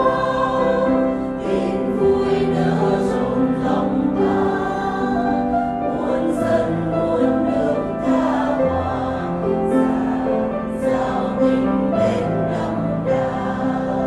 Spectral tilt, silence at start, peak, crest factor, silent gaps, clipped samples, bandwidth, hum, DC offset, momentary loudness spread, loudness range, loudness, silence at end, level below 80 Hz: -8 dB/octave; 0 s; -4 dBFS; 14 dB; none; under 0.1%; 11.5 kHz; none; under 0.1%; 4 LU; 1 LU; -19 LUFS; 0 s; -42 dBFS